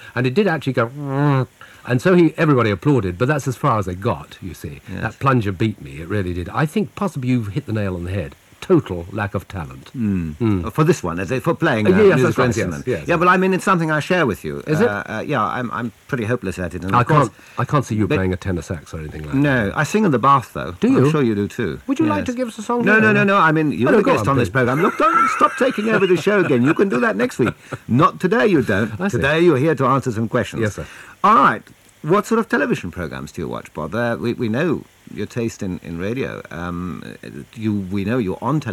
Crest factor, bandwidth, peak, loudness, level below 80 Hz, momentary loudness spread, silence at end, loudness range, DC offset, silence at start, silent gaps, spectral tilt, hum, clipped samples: 18 dB; 15.5 kHz; -2 dBFS; -18 LUFS; -46 dBFS; 14 LU; 0 s; 7 LU; under 0.1%; 0 s; none; -6.5 dB/octave; none; under 0.1%